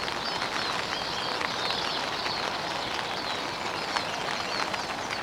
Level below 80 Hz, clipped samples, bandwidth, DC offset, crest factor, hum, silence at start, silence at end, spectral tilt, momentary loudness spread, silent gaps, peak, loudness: -58 dBFS; under 0.1%; 16.5 kHz; under 0.1%; 24 dB; none; 0 s; 0 s; -2 dB/octave; 3 LU; none; -6 dBFS; -29 LUFS